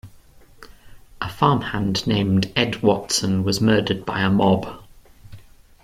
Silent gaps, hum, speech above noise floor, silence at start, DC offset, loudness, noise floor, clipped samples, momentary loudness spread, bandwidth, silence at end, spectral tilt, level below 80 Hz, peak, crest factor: none; none; 28 dB; 0.05 s; under 0.1%; -20 LUFS; -48 dBFS; under 0.1%; 5 LU; 15.5 kHz; 0.4 s; -5 dB/octave; -48 dBFS; -2 dBFS; 20 dB